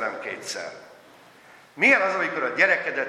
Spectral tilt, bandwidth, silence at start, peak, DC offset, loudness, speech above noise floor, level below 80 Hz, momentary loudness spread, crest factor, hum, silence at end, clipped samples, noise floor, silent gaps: -3 dB/octave; 13.5 kHz; 0 s; -4 dBFS; under 0.1%; -22 LUFS; 28 dB; -80 dBFS; 15 LU; 20 dB; none; 0 s; under 0.1%; -51 dBFS; none